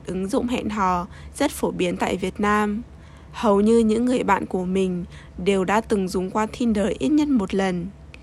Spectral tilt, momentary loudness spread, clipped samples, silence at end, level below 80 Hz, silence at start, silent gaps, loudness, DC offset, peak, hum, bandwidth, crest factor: -6 dB/octave; 9 LU; under 0.1%; 0 s; -44 dBFS; 0 s; none; -22 LUFS; under 0.1%; -6 dBFS; none; 13.5 kHz; 16 dB